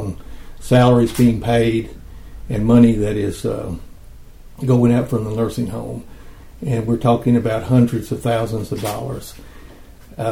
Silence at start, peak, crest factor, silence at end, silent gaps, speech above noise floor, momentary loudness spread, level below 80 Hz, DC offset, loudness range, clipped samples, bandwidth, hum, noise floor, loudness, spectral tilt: 0 s; 0 dBFS; 18 dB; 0 s; none; 24 dB; 18 LU; -36 dBFS; under 0.1%; 5 LU; under 0.1%; 16 kHz; none; -40 dBFS; -17 LUFS; -7.5 dB/octave